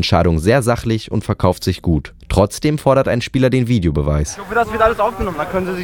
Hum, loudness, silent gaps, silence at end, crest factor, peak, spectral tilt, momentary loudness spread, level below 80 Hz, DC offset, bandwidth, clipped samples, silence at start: none; -17 LUFS; none; 0 s; 16 dB; 0 dBFS; -6 dB/octave; 6 LU; -30 dBFS; under 0.1%; 18 kHz; under 0.1%; 0 s